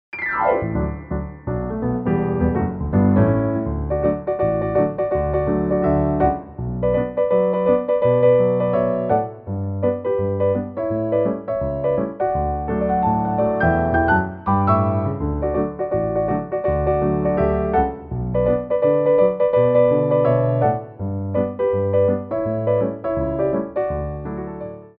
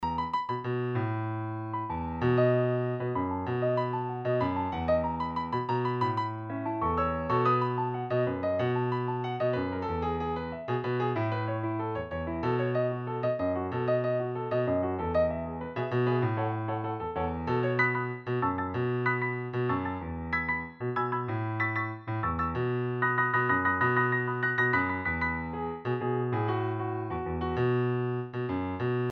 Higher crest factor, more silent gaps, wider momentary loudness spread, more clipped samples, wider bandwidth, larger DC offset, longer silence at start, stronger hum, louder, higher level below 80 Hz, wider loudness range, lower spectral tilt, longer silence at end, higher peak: about the same, 16 dB vs 16 dB; neither; about the same, 8 LU vs 7 LU; neither; second, 4.2 kHz vs 6 kHz; neither; first, 0.15 s vs 0 s; neither; first, -20 LUFS vs -30 LUFS; first, -36 dBFS vs -52 dBFS; about the same, 4 LU vs 4 LU; about the same, -8.5 dB/octave vs -9 dB/octave; about the same, 0.1 s vs 0 s; first, -4 dBFS vs -12 dBFS